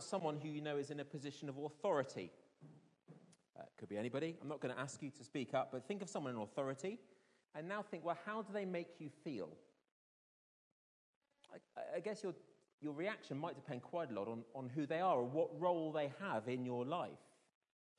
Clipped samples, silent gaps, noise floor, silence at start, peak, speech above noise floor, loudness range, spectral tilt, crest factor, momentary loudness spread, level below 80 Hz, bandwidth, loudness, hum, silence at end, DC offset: under 0.1%; 9.92-11.21 s, 12.73-12.78 s; -65 dBFS; 0 s; -26 dBFS; 22 dB; 10 LU; -6 dB/octave; 20 dB; 15 LU; under -90 dBFS; 10.5 kHz; -44 LUFS; none; 0.75 s; under 0.1%